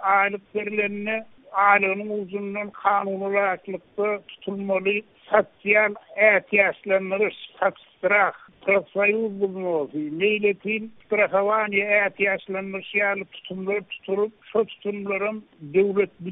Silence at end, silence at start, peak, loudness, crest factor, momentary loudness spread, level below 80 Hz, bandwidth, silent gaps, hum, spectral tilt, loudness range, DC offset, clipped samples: 0 s; 0 s; -4 dBFS; -23 LUFS; 20 dB; 10 LU; -70 dBFS; 3.9 kHz; none; none; 0.5 dB/octave; 5 LU; under 0.1%; under 0.1%